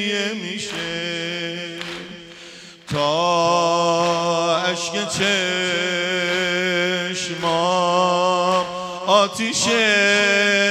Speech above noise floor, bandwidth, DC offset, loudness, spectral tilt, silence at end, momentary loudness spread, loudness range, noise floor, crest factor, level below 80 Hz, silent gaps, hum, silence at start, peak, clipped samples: 21 dB; 14.5 kHz; under 0.1%; -19 LUFS; -3 dB/octave; 0 s; 13 LU; 5 LU; -41 dBFS; 18 dB; -60 dBFS; none; none; 0 s; -2 dBFS; under 0.1%